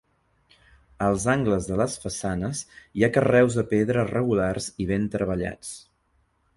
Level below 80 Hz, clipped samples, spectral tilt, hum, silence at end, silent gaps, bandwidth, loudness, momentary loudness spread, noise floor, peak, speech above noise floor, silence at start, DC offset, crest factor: -46 dBFS; under 0.1%; -6 dB/octave; none; 0.8 s; none; 11.5 kHz; -24 LUFS; 12 LU; -68 dBFS; -6 dBFS; 44 dB; 1 s; under 0.1%; 20 dB